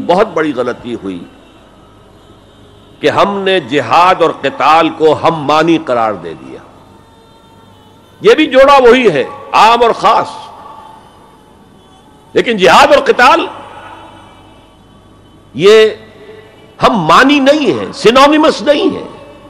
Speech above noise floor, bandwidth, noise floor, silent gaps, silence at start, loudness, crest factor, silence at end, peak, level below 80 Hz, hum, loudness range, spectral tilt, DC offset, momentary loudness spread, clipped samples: 32 dB; 15.5 kHz; -41 dBFS; none; 0 s; -9 LUFS; 10 dB; 0.25 s; 0 dBFS; -44 dBFS; none; 6 LU; -4.5 dB/octave; under 0.1%; 18 LU; 0.3%